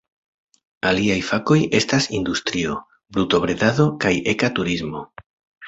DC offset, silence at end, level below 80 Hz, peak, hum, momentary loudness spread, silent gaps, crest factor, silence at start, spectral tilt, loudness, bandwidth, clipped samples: under 0.1%; 0 s; -48 dBFS; -2 dBFS; none; 9 LU; 5.26-5.52 s; 18 dB; 0.85 s; -5 dB/octave; -20 LUFS; 8.2 kHz; under 0.1%